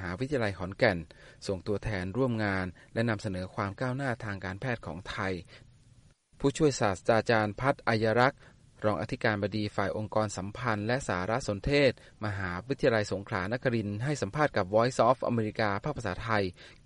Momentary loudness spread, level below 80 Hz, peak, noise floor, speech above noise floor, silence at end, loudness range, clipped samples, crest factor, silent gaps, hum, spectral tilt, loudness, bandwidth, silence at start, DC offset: 10 LU; -52 dBFS; -10 dBFS; -60 dBFS; 30 dB; 0.15 s; 5 LU; under 0.1%; 20 dB; none; none; -6 dB/octave; -30 LUFS; 11.5 kHz; 0 s; under 0.1%